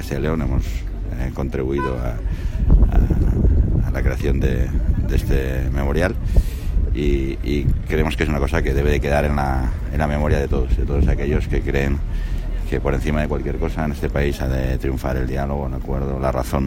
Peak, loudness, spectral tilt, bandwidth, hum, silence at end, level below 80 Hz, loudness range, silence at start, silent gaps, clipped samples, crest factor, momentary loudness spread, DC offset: -2 dBFS; -21 LUFS; -7.5 dB/octave; 16 kHz; none; 0 s; -22 dBFS; 3 LU; 0 s; none; under 0.1%; 16 dB; 7 LU; under 0.1%